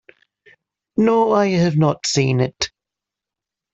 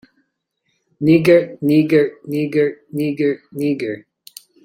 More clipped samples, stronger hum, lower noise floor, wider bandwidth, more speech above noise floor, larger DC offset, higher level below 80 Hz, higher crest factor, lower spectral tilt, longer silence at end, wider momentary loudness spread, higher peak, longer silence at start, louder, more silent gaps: neither; neither; first, -86 dBFS vs -71 dBFS; second, 8.2 kHz vs 16 kHz; first, 70 dB vs 55 dB; neither; first, -54 dBFS vs -60 dBFS; about the same, 18 dB vs 16 dB; second, -5.5 dB/octave vs -7.5 dB/octave; first, 1.05 s vs 0.65 s; about the same, 10 LU vs 10 LU; about the same, -2 dBFS vs -2 dBFS; about the same, 0.95 s vs 1 s; about the same, -18 LUFS vs -17 LUFS; neither